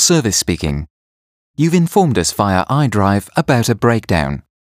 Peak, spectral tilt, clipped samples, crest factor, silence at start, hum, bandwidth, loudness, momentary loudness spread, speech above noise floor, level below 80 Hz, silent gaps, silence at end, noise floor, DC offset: 0 dBFS; -4.5 dB/octave; under 0.1%; 16 dB; 0 s; none; 15.5 kHz; -15 LUFS; 10 LU; over 76 dB; -36 dBFS; 0.90-1.54 s; 0.35 s; under -90 dBFS; under 0.1%